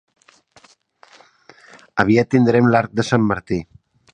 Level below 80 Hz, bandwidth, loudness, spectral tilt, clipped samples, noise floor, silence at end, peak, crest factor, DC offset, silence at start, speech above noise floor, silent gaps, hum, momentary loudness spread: -50 dBFS; 9.4 kHz; -17 LUFS; -7 dB/octave; under 0.1%; -53 dBFS; 0.5 s; 0 dBFS; 20 dB; under 0.1%; 1.95 s; 36 dB; none; none; 12 LU